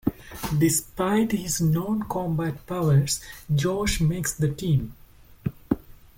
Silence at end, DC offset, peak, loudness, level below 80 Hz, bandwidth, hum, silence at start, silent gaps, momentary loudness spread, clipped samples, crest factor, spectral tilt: 0.25 s; under 0.1%; -8 dBFS; -25 LUFS; -42 dBFS; 17 kHz; none; 0.05 s; none; 9 LU; under 0.1%; 18 dB; -5.5 dB/octave